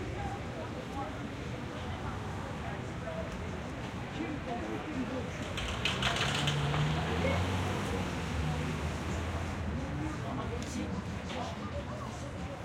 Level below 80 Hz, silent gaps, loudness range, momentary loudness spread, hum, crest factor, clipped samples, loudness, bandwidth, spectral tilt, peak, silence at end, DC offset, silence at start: -48 dBFS; none; 7 LU; 9 LU; none; 20 dB; under 0.1%; -36 LUFS; 16 kHz; -5 dB/octave; -16 dBFS; 0 s; under 0.1%; 0 s